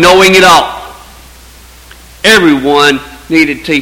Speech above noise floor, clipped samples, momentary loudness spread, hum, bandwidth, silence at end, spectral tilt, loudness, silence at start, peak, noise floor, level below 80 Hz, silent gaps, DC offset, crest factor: 29 dB; 3%; 13 LU; none; over 20 kHz; 0 s; -3.5 dB/octave; -6 LUFS; 0 s; 0 dBFS; -35 dBFS; -36 dBFS; none; under 0.1%; 8 dB